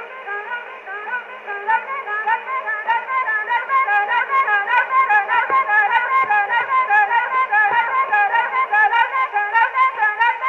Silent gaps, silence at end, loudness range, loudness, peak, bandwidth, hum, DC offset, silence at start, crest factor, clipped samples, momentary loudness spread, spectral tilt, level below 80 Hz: none; 0 s; 5 LU; -17 LUFS; -4 dBFS; 7.2 kHz; none; under 0.1%; 0 s; 16 dB; under 0.1%; 11 LU; -2 dB/octave; -70 dBFS